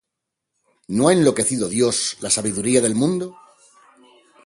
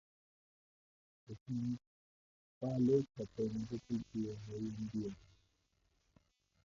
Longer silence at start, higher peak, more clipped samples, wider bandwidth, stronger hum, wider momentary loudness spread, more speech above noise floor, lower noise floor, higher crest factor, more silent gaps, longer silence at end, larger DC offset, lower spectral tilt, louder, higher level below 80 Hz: second, 0.9 s vs 1.3 s; first, -2 dBFS vs -22 dBFS; neither; first, 11.5 kHz vs 7.4 kHz; neither; second, 8 LU vs 14 LU; first, 63 dB vs 40 dB; about the same, -81 dBFS vs -79 dBFS; about the same, 20 dB vs 20 dB; second, none vs 1.41-1.46 s, 1.87-2.61 s; second, 1.15 s vs 1.45 s; neither; second, -4 dB/octave vs -9.5 dB/octave; first, -19 LUFS vs -40 LUFS; first, -58 dBFS vs -68 dBFS